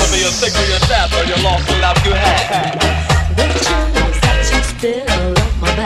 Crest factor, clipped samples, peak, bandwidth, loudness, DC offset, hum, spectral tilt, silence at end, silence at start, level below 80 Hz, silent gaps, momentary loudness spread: 14 dB; under 0.1%; 0 dBFS; 14 kHz; -14 LUFS; under 0.1%; none; -3.5 dB/octave; 0 s; 0 s; -18 dBFS; none; 3 LU